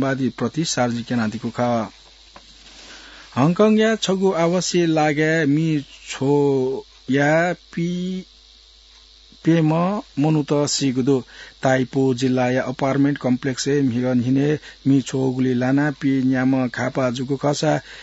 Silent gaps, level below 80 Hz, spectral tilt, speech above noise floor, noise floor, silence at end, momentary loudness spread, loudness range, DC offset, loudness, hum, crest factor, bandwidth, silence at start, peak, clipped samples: none; -54 dBFS; -5.5 dB/octave; 29 dB; -49 dBFS; 0 s; 7 LU; 4 LU; under 0.1%; -20 LUFS; none; 18 dB; 8 kHz; 0 s; -2 dBFS; under 0.1%